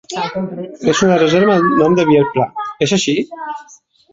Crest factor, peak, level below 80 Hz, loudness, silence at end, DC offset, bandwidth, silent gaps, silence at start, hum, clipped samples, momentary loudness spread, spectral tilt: 14 dB; -2 dBFS; -52 dBFS; -14 LUFS; 0.5 s; under 0.1%; 7.8 kHz; none; 0.1 s; none; under 0.1%; 13 LU; -5 dB/octave